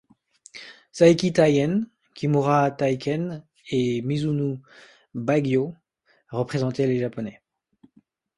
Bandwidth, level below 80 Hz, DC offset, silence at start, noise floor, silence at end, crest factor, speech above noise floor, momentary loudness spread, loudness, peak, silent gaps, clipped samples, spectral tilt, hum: 11.5 kHz; -60 dBFS; under 0.1%; 0.55 s; -62 dBFS; 1.05 s; 20 dB; 40 dB; 19 LU; -23 LUFS; -4 dBFS; none; under 0.1%; -7 dB/octave; none